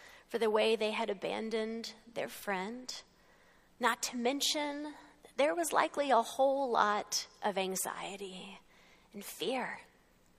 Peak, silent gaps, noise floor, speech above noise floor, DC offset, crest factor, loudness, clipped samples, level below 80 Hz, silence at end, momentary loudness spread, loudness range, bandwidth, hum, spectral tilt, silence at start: -12 dBFS; none; -65 dBFS; 31 dB; under 0.1%; 22 dB; -34 LUFS; under 0.1%; -74 dBFS; 0.55 s; 16 LU; 6 LU; 15.5 kHz; none; -2.5 dB/octave; 0 s